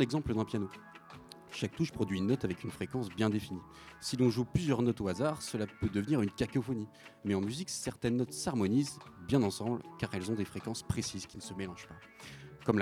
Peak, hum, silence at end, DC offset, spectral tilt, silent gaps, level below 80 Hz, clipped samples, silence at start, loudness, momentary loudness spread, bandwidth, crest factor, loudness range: -12 dBFS; none; 0 s; under 0.1%; -6 dB/octave; none; -58 dBFS; under 0.1%; 0 s; -35 LUFS; 16 LU; 15.5 kHz; 22 dB; 3 LU